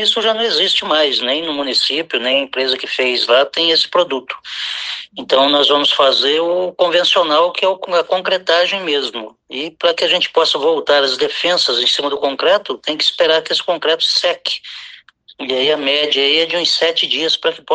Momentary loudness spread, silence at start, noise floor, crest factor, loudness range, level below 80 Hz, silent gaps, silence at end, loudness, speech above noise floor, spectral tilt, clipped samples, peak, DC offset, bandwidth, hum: 9 LU; 0 s; -42 dBFS; 16 dB; 2 LU; -66 dBFS; none; 0 s; -14 LUFS; 27 dB; -1.5 dB/octave; under 0.1%; 0 dBFS; under 0.1%; 9.6 kHz; none